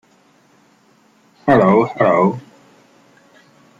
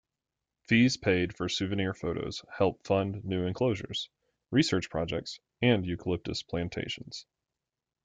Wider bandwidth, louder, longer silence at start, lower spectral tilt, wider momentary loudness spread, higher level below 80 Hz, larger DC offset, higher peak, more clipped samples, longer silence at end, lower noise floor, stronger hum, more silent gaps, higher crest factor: second, 7.6 kHz vs 9.4 kHz; first, -14 LUFS vs -30 LUFS; first, 1.45 s vs 0.7 s; first, -8.5 dB/octave vs -5.5 dB/octave; about the same, 11 LU vs 11 LU; about the same, -56 dBFS vs -58 dBFS; neither; first, -2 dBFS vs -10 dBFS; neither; first, 1.4 s vs 0.85 s; second, -54 dBFS vs -89 dBFS; neither; neither; about the same, 18 dB vs 22 dB